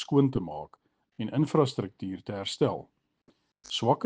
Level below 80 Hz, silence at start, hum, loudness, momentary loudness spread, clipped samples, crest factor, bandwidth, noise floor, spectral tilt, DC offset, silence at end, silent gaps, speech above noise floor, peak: -62 dBFS; 0 s; none; -30 LUFS; 14 LU; under 0.1%; 20 dB; 9.4 kHz; -68 dBFS; -6.5 dB/octave; under 0.1%; 0 s; none; 40 dB; -8 dBFS